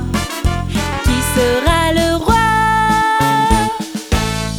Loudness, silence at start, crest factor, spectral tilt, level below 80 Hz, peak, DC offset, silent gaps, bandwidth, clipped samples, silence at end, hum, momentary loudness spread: -15 LUFS; 0 s; 12 dB; -4.5 dB/octave; -24 dBFS; -2 dBFS; under 0.1%; none; over 20 kHz; under 0.1%; 0 s; none; 6 LU